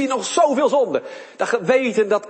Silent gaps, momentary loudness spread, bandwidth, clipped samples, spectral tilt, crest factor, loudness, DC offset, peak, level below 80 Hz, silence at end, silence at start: none; 10 LU; 8.8 kHz; under 0.1%; -3.5 dB/octave; 16 dB; -19 LUFS; under 0.1%; -4 dBFS; -72 dBFS; 0 s; 0 s